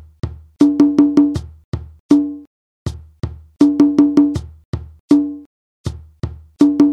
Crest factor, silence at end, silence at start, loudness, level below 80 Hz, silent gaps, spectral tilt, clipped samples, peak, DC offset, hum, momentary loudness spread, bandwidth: 16 dB; 0 s; 0.25 s; -14 LUFS; -38 dBFS; 1.64-1.72 s, 2.00-2.09 s, 2.47-2.86 s, 4.65-4.73 s, 5.00-5.08 s, 5.46-5.84 s; -8 dB/octave; under 0.1%; 0 dBFS; under 0.1%; none; 18 LU; 8.6 kHz